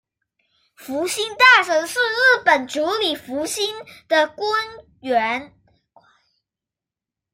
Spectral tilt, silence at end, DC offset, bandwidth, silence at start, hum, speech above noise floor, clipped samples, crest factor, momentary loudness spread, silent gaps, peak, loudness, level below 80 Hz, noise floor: -1 dB/octave; 1.9 s; under 0.1%; 16 kHz; 0.8 s; none; 69 dB; under 0.1%; 20 dB; 14 LU; none; -2 dBFS; -18 LUFS; -64 dBFS; -88 dBFS